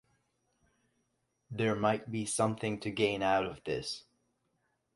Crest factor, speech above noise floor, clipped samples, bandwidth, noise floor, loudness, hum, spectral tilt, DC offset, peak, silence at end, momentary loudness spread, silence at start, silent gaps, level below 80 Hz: 20 dB; 47 dB; under 0.1%; 11.5 kHz; -79 dBFS; -33 LUFS; none; -4.5 dB/octave; under 0.1%; -16 dBFS; 0.95 s; 8 LU; 1.5 s; none; -66 dBFS